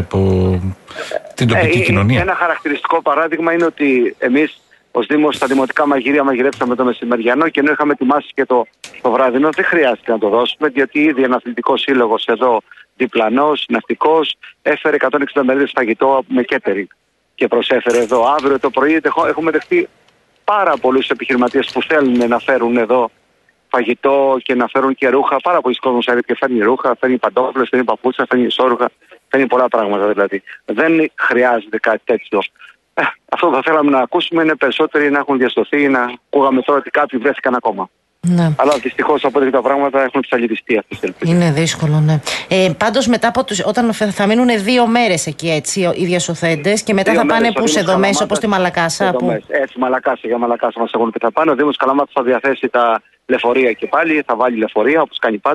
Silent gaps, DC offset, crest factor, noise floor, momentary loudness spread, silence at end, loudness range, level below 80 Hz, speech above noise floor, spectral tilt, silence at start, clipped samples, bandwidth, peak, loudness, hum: none; under 0.1%; 14 dB; -57 dBFS; 5 LU; 0 s; 1 LU; -50 dBFS; 43 dB; -5 dB/octave; 0 s; under 0.1%; 12 kHz; 0 dBFS; -15 LUFS; none